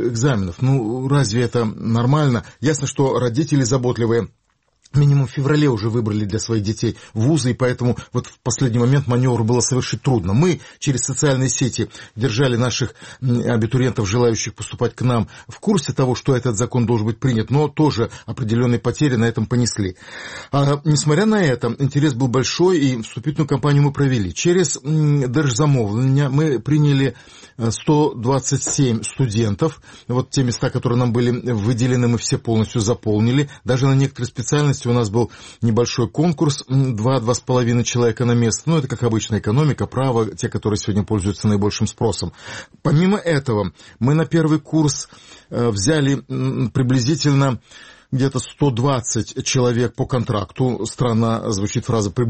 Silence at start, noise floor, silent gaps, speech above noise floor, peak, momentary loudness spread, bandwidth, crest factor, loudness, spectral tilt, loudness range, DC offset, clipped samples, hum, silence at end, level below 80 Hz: 0 s; -58 dBFS; none; 40 dB; -4 dBFS; 7 LU; 8.8 kHz; 14 dB; -19 LUFS; -6 dB/octave; 2 LU; 0.2%; under 0.1%; none; 0 s; -46 dBFS